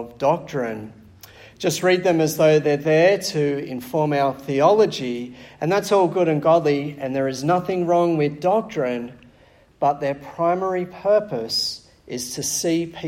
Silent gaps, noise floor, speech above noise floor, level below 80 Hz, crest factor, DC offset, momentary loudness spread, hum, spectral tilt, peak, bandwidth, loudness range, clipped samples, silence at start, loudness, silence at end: none; -53 dBFS; 33 dB; -60 dBFS; 18 dB; under 0.1%; 12 LU; none; -5 dB/octave; -4 dBFS; 16.5 kHz; 4 LU; under 0.1%; 0 s; -21 LUFS; 0 s